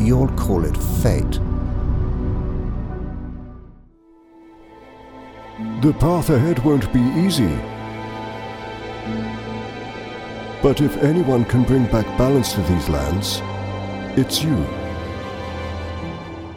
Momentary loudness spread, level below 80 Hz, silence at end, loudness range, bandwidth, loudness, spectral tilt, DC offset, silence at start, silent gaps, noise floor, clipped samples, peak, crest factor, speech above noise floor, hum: 14 LU; -30 dBFS; 0 s; 9 LU; 18 kHz; -21 LUFS; -6.5 dB/octave; under 0.1%; 0 s; none; -50 dBFS; under 0.1%; -4 dBFS; 16 dB; 32 dB; none